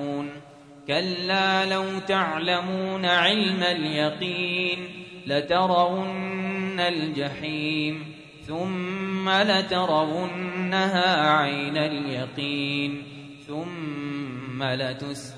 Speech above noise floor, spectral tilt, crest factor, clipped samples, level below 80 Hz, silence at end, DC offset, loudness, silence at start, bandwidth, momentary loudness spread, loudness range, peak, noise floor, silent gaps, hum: 21 dB; -5 dB/octave; 18 dB; under 0.1%; -64 dBFS; 0 s; under 0.1%; -25 LUFS; 0 s; 11 kHz; 13 LU; 5 LU; -6 dBFS; -46 dBFS; none; none